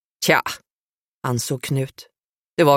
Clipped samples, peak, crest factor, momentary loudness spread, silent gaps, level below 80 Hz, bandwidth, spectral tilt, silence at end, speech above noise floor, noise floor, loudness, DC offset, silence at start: under 0.1%; -2 dBFS; 20 dB; 13 LU; 0.71-1.21 s, 2.25-2.57 s; -62 dBFS; 16.5 kHz; -4.5 dB/octave; 0 s; over 68 dB; under -90 dBFS; -22 LUFS; under 0.1%; 0.2 s